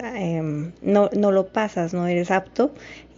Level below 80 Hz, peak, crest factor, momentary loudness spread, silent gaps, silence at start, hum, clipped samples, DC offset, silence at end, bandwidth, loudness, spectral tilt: -56 dBFS; -6 dBFS; 16 dB; 8 LU; none; 0 s; none; under 0.1%; under 0.1%; 0.15 s; 7.6 kHz; -22 LUFS; -7 dB/octave